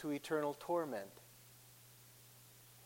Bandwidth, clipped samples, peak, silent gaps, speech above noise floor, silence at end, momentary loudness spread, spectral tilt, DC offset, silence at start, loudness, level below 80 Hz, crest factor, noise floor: 16.5 kHz; under 0.1%; -26 dBFS; none; 21 dB; 0 s; 20 LU; -5 dB/octave; under 0.1%; 0 s; -41 LUFS; -82 dBFS; 18 dB; -62 dBFS